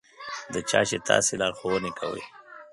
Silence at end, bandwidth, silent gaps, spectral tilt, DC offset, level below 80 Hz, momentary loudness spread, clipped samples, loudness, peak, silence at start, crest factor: 0.05 s; 11.5 kHz; none; -2.5 dB/octave; under 0.1%; -60 dBFS; 16 LU; under 0.1%; -26 LUFS; -4 dBFS; 0.2 s; 24 dB